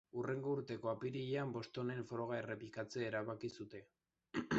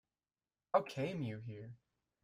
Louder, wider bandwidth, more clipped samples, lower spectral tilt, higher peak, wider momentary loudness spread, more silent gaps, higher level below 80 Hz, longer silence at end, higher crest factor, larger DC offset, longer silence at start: second, -44 LUFS vs -40 LUFS; second, 8 kHz vs 13.5 kHz; neither; second, -5.5 dB/octave vs -7 dB/octave; second, -26 dBFS vs -18 dBFS; second, 6 LU vs 16 LU; neither; about the same, -76 dBFS vs -78 dBFS; second, 0 s vs 0.5 s; second, 18 dB vs 24 dB; neither; second, 0.15 s vs 0.75 s